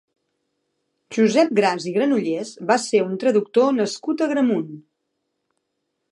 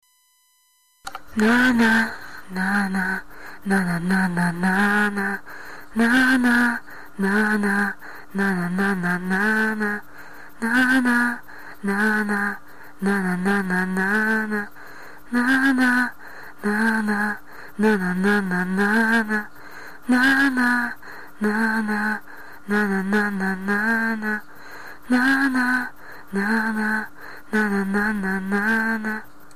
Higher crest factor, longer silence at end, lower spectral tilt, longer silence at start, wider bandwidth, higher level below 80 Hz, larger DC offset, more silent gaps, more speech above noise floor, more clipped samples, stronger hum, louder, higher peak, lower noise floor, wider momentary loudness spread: first, 18 dB vs 12 dB; first, 1.3 s vs 0.3 s; about the same, -5 dB/octave vs -5.5 dB/octave; first, 1.1 s vs 0 s; second, 11.5 kHz vs 14 kHz; second, -78 dBFS vs -54 dBFS; second, under 0.1% vs 1%; neither; first, 57 dB vs 41 dB; neither; neither; about the same, -20 LUFS vs -21 LUFS; first, -2 dBFS vs -10 dBFS; first, -76 dBFS vs -62 dBFS; second, 9 LU vs 19 LU